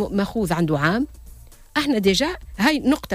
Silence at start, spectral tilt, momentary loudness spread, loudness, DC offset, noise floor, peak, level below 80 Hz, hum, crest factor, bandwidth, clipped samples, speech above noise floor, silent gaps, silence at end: 0 s; -5 dB/octave; 7 LU; -21 LUFS; under 0.1%; -43 dBFS; -8 dBFS; -42 dBFS; none; 14 dB; 15.5 kHz; under 0.1%; 23 dB; none; 0 s